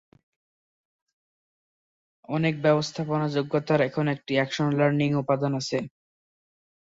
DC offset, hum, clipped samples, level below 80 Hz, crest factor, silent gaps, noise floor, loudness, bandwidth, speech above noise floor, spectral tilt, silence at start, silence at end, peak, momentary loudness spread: under 0.1%; none; under 0.1%; -66 dBFS; 18 dB; none; under -90 dBFS; -25 LUFS; 7.8 kHz; over 65 dB; -6.5 dB/octave; 2.3 s; 1.05 s; -8 dBFS; 6 LU